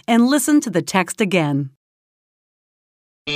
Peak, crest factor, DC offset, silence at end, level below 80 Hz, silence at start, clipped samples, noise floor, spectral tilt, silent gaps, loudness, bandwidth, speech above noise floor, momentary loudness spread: 0 dBFS; 20 dB; under 0.1%; 0 s; -64 dBFS; 0.1 s; under 0.1%; under -90 dBFS; -4.5 dB/octave; 1.77-3.25 s; -18 LUFS; 16 kHz; over 73 dB; 12 LU